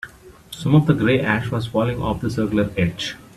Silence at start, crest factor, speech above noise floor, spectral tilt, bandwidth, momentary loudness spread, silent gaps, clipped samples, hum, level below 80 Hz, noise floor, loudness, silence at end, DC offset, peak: 0.05 s; 18 dB; 22 dB; -7 dB/octave; 13 kHz; 11 LU; none; under 0.1%; none; -42 dBFS; -41 dBFS; -20 LUFS; 0.15 s; under 0.1%; -2 dBFS